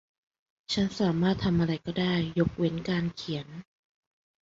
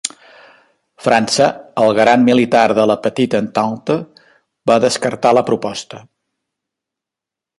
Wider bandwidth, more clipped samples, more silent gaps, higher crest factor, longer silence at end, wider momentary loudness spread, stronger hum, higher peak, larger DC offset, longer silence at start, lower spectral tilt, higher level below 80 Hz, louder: second, 7.8 kHz vs 11.5 kHz; neither; neither; about the same, 18 dB vs 16 dB; second, 0.8 s vs 1.6 s; about the same, 9 LU vs 11 LU; neither; second, -12 dBFS vs 0 dBFS; neither; first, 0.7 s vs 0.05 s; first, -6.5 dB/octave vs -4.5 dB/octave; first, -52 dBFS vs -58 dBFS; second, -29 LUFS vs -14 LUFS